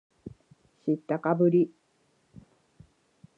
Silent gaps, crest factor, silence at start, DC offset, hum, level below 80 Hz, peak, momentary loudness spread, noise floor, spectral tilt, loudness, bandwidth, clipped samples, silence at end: none; 20 dB; 0.25 s; under 0.1%; none; -68 dBFS; -12 dBFS; 25 LU; -69 dBFS; -10.5 dB/octave; -27 LUFS; 4.1 kHz; under 0.1%; 1.7 s